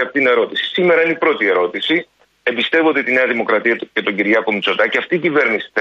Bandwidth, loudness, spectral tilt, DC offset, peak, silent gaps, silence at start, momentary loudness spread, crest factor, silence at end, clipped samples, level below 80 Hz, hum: 7.6 kHz; -15 LUFS; -5.5 dB/octave; under 0.1%; -2 dBFS; none; 0 s; 5 LU; 14 dB; 0 s; under 0.1%; -68 dBFS; none